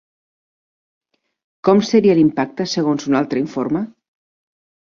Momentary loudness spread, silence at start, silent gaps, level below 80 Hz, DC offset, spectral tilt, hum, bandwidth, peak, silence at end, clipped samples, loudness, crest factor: 9 LU; 1.65 s; none; -60 dBFS; under 0.1%; -6 dB/octave; none; 7.4 kHz; -2 dBFS; 1 s; under 0.1%; -17 LUFS; 18 dB